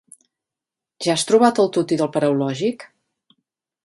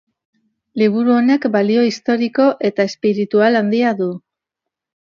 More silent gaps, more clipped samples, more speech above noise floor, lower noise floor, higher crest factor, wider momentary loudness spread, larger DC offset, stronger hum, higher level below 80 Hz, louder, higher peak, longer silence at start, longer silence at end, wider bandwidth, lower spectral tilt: neither; neither; about the same, 69 dB vs 68 dB; first, -87 dBFS vs -82 dBFS; about the same, 20 dB vs 16 dB; first, 10 LU vs 6 LU; neither; neither; about the same, -68 dBFS vs -68 dBFS; second, -19 LUFS vs -16 LUFS; about the same, -2 dBFS vs 0 dBFS; first, 1 s vs 0.75 s; about the same, 1 s vs 0.95 s; first, 11.5 kHz vs 7.2 kHz; second, -5 dB/octave vs -6.5 dB/octave